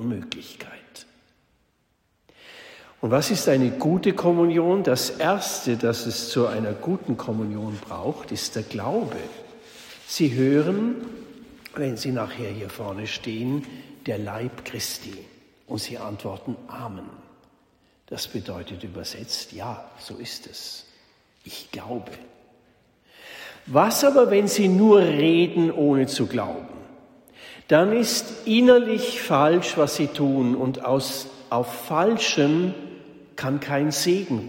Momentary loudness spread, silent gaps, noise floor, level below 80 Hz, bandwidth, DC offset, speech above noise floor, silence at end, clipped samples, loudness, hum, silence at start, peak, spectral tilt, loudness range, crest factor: 21 LU; none; -68 dBFS; -64 dBFS; 16.5 kHz; under 0.1%; 46 dB; 0 s; under 0.1%; -23 LUFS; none; 0 s; -4 dBFS; -5 dB/octave; 15 LU; 20 dB